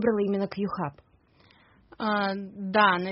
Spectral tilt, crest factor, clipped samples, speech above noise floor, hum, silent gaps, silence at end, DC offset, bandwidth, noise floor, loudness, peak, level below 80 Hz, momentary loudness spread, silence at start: -3.5 dB/octave; 20 dB; under 0.1%; 34 dB; none; none; 0 s; under 0.1%; 5.8 kHz; -60 dBFS; -27 LUFS; -8 dBFS; -64 dBFS; 12 LU; 0 s